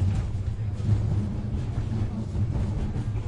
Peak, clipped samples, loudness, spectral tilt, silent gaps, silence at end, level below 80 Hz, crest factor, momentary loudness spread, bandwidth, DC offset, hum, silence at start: -12 dBFS; under 0.1%; -29 LUFS; -8.5 dB/octave; none; 0 s; -34 dBFS; 14 dB; 5 LU; 9.2 kHz; under 0.1%; none; 0 s